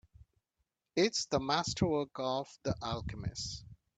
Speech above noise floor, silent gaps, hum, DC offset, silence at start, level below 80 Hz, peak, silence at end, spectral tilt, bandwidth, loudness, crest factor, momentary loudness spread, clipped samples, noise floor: 50 dB; none; none; under 0.1%; 0.2 s; -56 dBFS; -16 dBFS; 0.2 s; -4.5 dB/octave; 9.4 kHz; -35 LUFS; 20 dB; 9 LU; under 0.1%; -84 dBFS